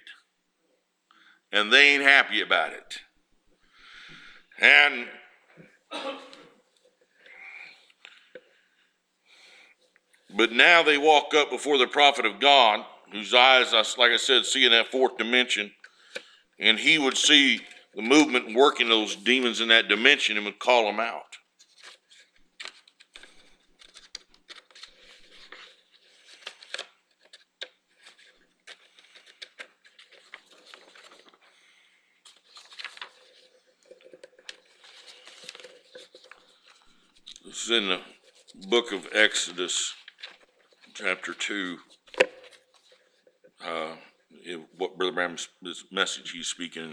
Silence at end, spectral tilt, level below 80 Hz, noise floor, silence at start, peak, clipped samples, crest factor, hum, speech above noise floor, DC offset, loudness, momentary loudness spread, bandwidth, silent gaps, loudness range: 0 s; -1 dB/octave; -76 dBFS; -73 dBFS; 0.05 s; -2 dBFS; under 0.1%; 26 dB; none; 50 dB; under 0.1%; -21 LUFS; 26 LU; 14 kHz; none; 23 LU